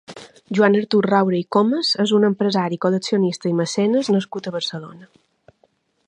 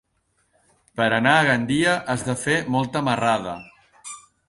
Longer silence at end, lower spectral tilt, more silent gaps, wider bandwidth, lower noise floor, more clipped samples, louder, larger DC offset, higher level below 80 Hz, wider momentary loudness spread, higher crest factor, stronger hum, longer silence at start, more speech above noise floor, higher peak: first, 1.05 s vs 0.3 s; about the same, -5.5 dB/octave vs -4.5 dB/octave; neither; second, 10 kHz vs 11.5 kHz; second, -63 dBFS vs -69 dBFS; neither; about the same, -19 LUFS vs -21 LUFS; neither; second, -70 dBFS vs -56 dBFS; second, 10 LU vs 21 LU; about the same, 18 dB vs 20 dB; neither; second, 0.1 s vs 0.95 s; second, 44 dB vs 48 dB; about the same, -2 dBFS vs -4 dBFS